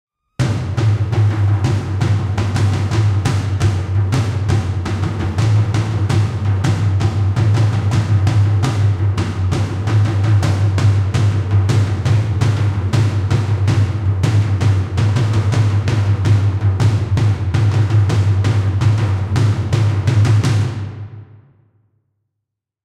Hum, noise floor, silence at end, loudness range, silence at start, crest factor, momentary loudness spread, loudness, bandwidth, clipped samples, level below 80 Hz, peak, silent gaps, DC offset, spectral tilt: none; -79 dBFS; 1.6 s; 2 LU; 0.4 s; 10 dB; 4 LU; -16 LUFS; 10 kHz; under 0.1%; -36 dBFS; -4 dBFS; none; under 0.1%; -7 dB/octave